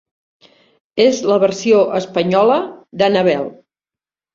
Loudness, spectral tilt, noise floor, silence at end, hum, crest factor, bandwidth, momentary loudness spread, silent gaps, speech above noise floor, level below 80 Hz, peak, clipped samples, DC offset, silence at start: -15 LUFS; -5 dB/octave; under -90 dBFS; 0.8 s; none; 16 dB; 7.6 kHz; 9 LU; none; over 76 dB; -60 dBFS; -2 dBFS; under 0.1%; under 0.1%; 0.95 s